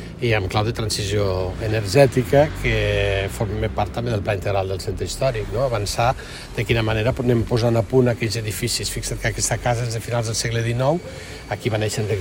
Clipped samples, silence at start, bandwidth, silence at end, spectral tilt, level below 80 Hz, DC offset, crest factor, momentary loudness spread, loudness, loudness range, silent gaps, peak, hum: under 0.1%; 0 s; 16.5 kHz; 0 s; -5 dB/octave; -36 dBFS; under 0.1%; 20 dB; 7 LU; -21 LUFS; 3 LU; none; -2 dBFS; none